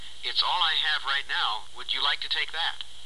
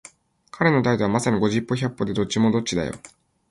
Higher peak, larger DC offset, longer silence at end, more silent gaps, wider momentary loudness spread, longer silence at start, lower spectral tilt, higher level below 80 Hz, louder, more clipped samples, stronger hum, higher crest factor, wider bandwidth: second, -10 dBFS vs -4 dBFS; first, 2% vs under 0.1%; second, 0 s vs 0.45 s; neither; about the same, 7 LU vs 7 LU; second, 0 s vs 0.55 s; second, 0.5 dB/octave vs -5.5 dB/octave; second, -60 dBFS vs -52 dBFS; second, -26 LUFS vs -22 LUFS; neither; neither; about the same, 18 dB vs 18 dB; about the same, 12.5 kHz vs 11.5 kHz